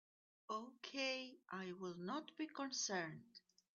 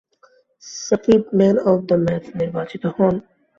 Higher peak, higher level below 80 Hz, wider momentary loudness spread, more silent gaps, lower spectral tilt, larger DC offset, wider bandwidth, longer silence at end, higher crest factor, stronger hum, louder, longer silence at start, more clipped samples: second, -30 dBFS vs -2 dBFS; second, under -90 dBFS vs -52 dBFS; about the same, 9 LU vs 11 LU; neither; second, -2.5 dB/octave vs -7 dB/octave; neither; first, 8.2 kHz vs 7.4 kHz; about the same, 0.35 s vs 0.4 s; about the same, 18 dB vs 16 dB; neither; second, -46 LUFS vs -19 LUFS; second, 0.5 s vs 0.65 s; neither